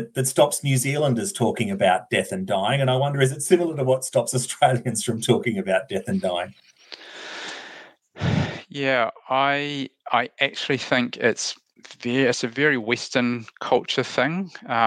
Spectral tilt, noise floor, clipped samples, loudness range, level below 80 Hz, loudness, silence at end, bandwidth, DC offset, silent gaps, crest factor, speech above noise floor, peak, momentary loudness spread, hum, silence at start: -4.5 dB/octave; -46 dBFS; under 0.1%; 5 LU; -60 dBFS; -23 LUFS; 0 s; 14 kHz; under 0.1%; none; 20 dB; 23 dB; -4 dBFS; 11 LU; none; 0 s